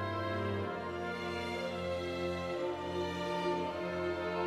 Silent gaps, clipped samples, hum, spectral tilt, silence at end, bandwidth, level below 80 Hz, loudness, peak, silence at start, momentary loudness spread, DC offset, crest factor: none; under 0.1%; none; -6 dB/octave; 0 s; 14 kHz; -62 dBFS; -37 LUFS; -22 dBFS; 0 s; 3 LU; under 0.1%; 14 dB